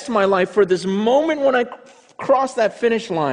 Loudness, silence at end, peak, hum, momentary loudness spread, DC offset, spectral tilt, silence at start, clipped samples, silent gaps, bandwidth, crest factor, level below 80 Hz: -18 LUFS; 0 s; -4 dBFS; none; 4 LU; under 0.1%; -5.5 dB/octave; 0 s; under 0.1%; none; 10.5 kHz; 14 dB; -60 dBFS